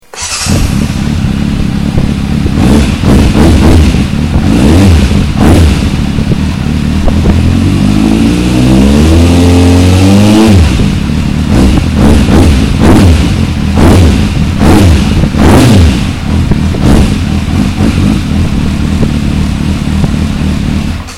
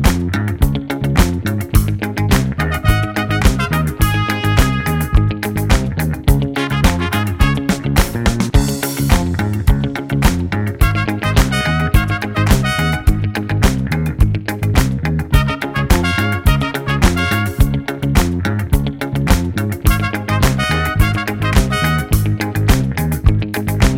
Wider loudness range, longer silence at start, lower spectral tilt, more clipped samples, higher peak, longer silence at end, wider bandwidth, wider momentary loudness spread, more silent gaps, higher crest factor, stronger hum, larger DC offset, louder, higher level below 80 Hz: first, 4 LU vs 1 LU; first, 0.15 s vs 0 s; about the same, -6.5 dB/octave vs -5.5 dB/octave; first, 5% vs under 0.1%; about the same, 0 dBFS vs 0 dBFS; about the same, 0 s vs 0 s; second, 14.5 kHz vs 17 kHz; first, 7 LU vs 4 LU; neither; second, 6 dB vs 14 dB; neither; neither; first, -7 LUFS vs -16 LUFS; first, -12 dBFS vs -20 dBFS